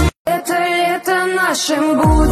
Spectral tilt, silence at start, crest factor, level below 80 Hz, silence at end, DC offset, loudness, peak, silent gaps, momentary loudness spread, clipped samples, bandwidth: -4.5 dB/octave; 0 s; 12 dB; -24 dBFS; 0 s; under 0.1%; -15 LUFS; -4 dBFS; 0.16-0.25 s; 4 LU; under 0.1%; 14.5 kHz